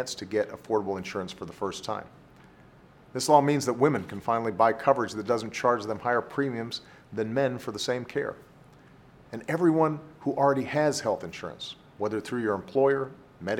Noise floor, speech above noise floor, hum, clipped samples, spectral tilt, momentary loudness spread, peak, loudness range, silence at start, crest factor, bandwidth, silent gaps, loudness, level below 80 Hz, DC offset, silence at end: -54 dBFS; 27 dB; none; under 0.1%; -5 dB/octave; 14 LU; -6 dBFS; 6 LU; 0 s; 22 dB; 17.5 kHz; none; -28 LUFS; -66 dBFS; under 0.1%; 0 s